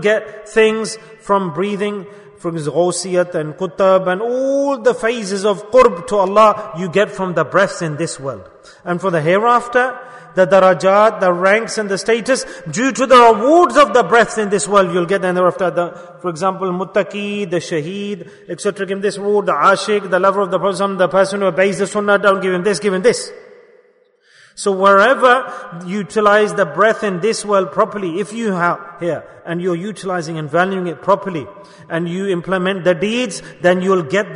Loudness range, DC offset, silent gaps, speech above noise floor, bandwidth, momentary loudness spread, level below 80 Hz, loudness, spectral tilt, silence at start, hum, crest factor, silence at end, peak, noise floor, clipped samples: 7 LU; under 0.1%; none; 39 dB; 11 kHz; 12 LU; -54 dBFS; -15 LUFS; -4.5 dB/octave; 0 s; none; 16 dB; 0 s; 0 dBFS; -54 dBFS; under 0.1%